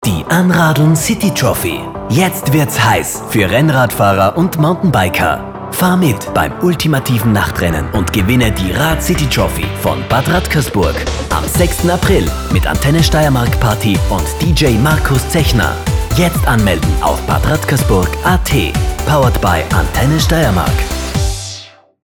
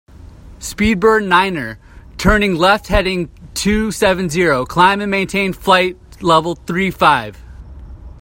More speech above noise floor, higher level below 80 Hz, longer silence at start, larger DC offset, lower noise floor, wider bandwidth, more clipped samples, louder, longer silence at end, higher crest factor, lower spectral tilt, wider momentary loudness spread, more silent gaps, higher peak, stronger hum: about the same, 22 dB vs 23 dB; first, -22 dBFS vs -30 dBFS; second, 0 s vs 0.2 s; neither; about the same, -34 dBFS vs -37 dBFS; first, over 20 kHz vs 16.5 kHz; neither; about the same, -13 LUFS vs -15 LUFS; first, 0.35 s vs 0 s; about the same, 12 dB vs 16 dB; about the same, -5 dB/octave vs -4.5 dB/octave; second, 6 LU vs 11 LU; neither; about the same, 0 dBFS vs 0 dBFS; neither